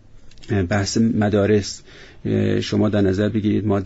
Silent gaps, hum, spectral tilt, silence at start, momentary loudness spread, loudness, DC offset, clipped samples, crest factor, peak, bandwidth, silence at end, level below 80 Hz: none; none; -6.5 dB/octave; 0.15 s; 7 LU; -20 LUFS; under 0.1%; under 0.1%; 14 dB; -6 dBFS; 8 kHz; 0 s; -46 dBFS